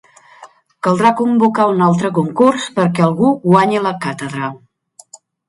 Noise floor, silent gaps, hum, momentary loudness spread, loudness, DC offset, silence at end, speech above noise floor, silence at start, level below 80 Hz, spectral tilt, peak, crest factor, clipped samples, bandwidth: -43 dBFS; none; none; 10 LU; -14 LUFS; under 0.1%; 0.9 s; 29 dB; 0.4 s; -60 dBFS; -7 dB/octave; 0 dBFS; 16 dB; under 0.1%; 11.5 kHz